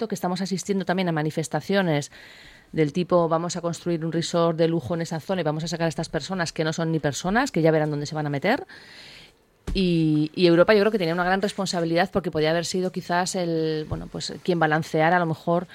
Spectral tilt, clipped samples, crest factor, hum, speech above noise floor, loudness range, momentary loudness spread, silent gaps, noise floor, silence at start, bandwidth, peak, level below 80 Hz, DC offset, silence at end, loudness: -5.5 dB/octave; under 0.1%; 20 dB; none; 29 dB; 3 LU; 8 LU; none; -52 dBFS; 0 s; 15.5 kHz; -4 dBFS; -48 dBFS; under 0.1%; 0 s; -24 LUFS